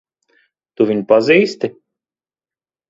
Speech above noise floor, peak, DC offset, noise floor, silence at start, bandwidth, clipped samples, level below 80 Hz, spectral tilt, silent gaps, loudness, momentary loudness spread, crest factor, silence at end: over 76 dB; 0 dBFS; under 0.1%; under -90 dBFS; 0.8 s; 7.8 kHz; under 0.1%; -64 dBFS; -6 dB/octave; none; -15 LUFS; 13 LU; 18 dB; 1.2 s